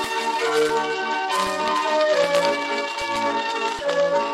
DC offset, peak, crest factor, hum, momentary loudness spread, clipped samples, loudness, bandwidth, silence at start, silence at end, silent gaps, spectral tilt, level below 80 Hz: under 0.1%; -6 dBFS; 16 dB; none; 5 LU; under 0.1%; -22 LUFS; 15.5 kHz; 0 s; 0 s; none; -2.5 dB/octave; -58 dBFS